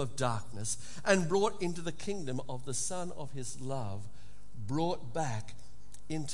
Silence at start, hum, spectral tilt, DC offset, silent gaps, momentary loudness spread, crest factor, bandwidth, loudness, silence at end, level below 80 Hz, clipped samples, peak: 0 s; none; -4.5 dB/octave; 2%; none; 13 LU; 24 dB; 11.5 kHz; -35 LUFS; 0 s; -58 dBFS; under 0.1%; -10 dBFS